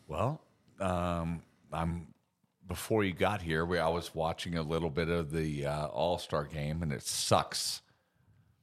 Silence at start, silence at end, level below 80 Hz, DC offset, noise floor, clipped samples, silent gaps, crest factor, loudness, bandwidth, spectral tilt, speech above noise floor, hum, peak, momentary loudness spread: 0.1 s; 0.85 s; -52 dBFS; under 0.1%; -74 dBFS; under 0.1%; none; 22 dB; -34 LUFS; 15 kHz; -4.5 dB/octave; 41 dB; none; -12 dBFS; 10 LU